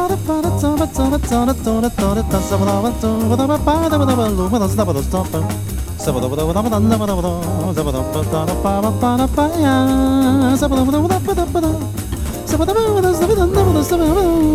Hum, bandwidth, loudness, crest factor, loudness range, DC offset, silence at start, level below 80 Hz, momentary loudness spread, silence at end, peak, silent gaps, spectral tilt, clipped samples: none; 16.5 kHz; -16 LUFS; 14 dB; 3 LU; under 0.1%; 0 s; -26 dBFS; 6 LU; 0 s; 0 dBFS; none; -6.5 dB/octave; under 0.1%